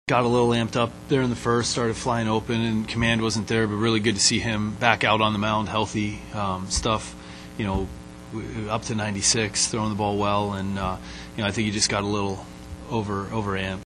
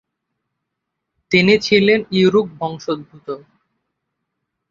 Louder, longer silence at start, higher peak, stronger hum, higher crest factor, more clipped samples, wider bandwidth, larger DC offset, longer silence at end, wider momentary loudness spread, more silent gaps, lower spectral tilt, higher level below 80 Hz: second, -24 LUFS vs -16 LUFS; second, 0.05 s vs 1.3 s; about the same, 0 dBFS vs 0 dBFS; neither; first, 24 dB vs 18 dB; neither; first, 12 kHz vs 7.4 kHz; neither; second, 0 s vs 1.35 s; second, 11 LU vs 18 LU; neither; second, -4 dB/octave vs -5.5 dB/octave; first, -42 dBFS vs -56 dBFS